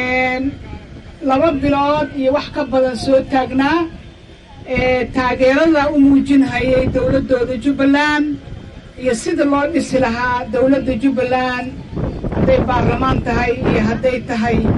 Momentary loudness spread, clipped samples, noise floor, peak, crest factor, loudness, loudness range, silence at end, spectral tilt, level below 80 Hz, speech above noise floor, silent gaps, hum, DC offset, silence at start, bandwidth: 10 LU; under 0.1%; -39 dBFS; -2 dBFS; 12 dB; -16 LUFS; 3 LU; 0 s; -6.5 dB/octave; -32 dBFS; 24 dB; none; none; under 0.1%; 0 s; 11 kHz